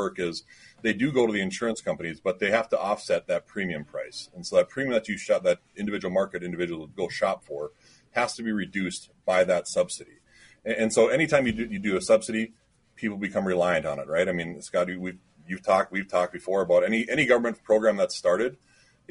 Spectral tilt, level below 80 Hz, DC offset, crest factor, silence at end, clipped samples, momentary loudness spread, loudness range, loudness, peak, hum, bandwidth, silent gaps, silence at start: -4.5 dB/octave; -60 dBFS; under 0.1%; 20 dB; 0.55 s; under 0.1%; 11 LU; 4 LU; -26 LUFS; -6 dBFS; none; 11 kHz; none; 0 s